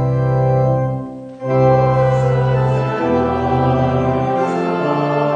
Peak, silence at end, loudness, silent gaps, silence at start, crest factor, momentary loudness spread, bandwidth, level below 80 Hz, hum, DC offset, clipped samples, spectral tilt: -2 dBFS; 0 s; -16 LUFS; none; 0 s; 12 dB; 6 LU; 7.4 kHz; -38 dBFS; none; under 0.1%; under 0.1%; -9 dB/octave